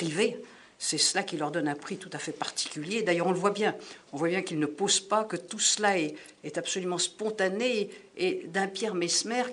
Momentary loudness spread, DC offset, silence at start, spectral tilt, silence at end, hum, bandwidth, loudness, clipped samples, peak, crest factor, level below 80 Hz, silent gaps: 11 LU; under 0.1%; 0 s; -2.5 dB/octave; 0 s; none; 11 kHz; -29 LUFS; under 0.1%; -10 dBFS; 20 dB; -78 dBFS; none